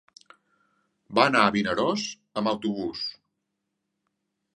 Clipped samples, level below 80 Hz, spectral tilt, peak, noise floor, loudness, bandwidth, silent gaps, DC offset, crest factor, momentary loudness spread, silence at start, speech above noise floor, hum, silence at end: under 0.1%; -64 dBFS; -4.5 dB/octave; -2 dBFS; -81 dBFS; -25 LUFS; 10.5 kHz; none; under 0.1%; 26 dB; 12 LU; 1.1 s; 56 dB; none; 1.45 s